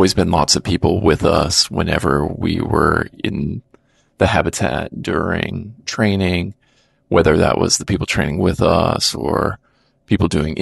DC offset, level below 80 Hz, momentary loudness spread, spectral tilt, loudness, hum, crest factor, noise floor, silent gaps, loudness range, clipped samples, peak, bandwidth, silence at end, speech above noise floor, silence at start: under 0.1%; -34 dBFS; 9 LU; -4.5 dB/octave; -17 LUFS; none; 16 dB; -58 dBFS; none; 4 LU; under 0.1%; -2 dBFS; 12.5 kHz; 0 s; 42 dB; 0 s